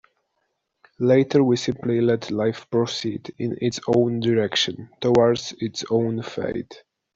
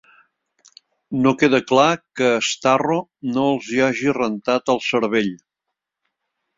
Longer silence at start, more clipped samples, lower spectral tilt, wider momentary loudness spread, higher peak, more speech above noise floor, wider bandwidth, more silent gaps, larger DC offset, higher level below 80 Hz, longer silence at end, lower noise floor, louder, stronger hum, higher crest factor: about the same, 1 s vs 1.1 s; neither; about the same, -5.5 dB/octave vs -4.5 dB/octave; first, 11 LU vs 7 LU; second, -6 dBFS vs -2 dBFS; second, 53 dB vs 63 dB; about the same, 7.8 kHz vs 7.8 kHz; neither; neither; about the same, -58 dBFS vs -60 dBFS; second, 0.4 s vs 1.2 s; second, -74 dBFS vs -81 dBFS; second, -22 LUFS vs -19 LUFS; neither; about the same, 16 dB vs 20 dB